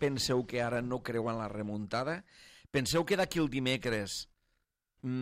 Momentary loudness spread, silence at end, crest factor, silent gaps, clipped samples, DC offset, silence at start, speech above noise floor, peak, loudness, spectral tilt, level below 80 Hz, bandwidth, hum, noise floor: 9 LU; 0 s; 16 dB; none; under 0.1%; under 0.1%; 0 s; 47 dB; -18 dBFS; -34 LUFS; -4.5 dB/octave; -58 dBFS; 16 kHz; none; -80 dBFS